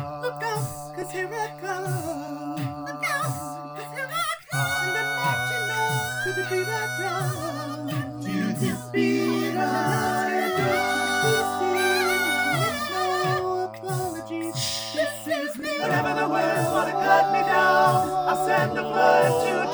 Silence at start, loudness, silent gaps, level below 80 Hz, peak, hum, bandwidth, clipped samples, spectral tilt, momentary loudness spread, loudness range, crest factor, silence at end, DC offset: 0 s; -24 LUFS; none; -64 dBFS; -6 dBFS; none; over 20 kHz; under 0.1%; -4.5 dB/octave; 11 LU; 7 LU; 20 dB; 0 s; under 0.1%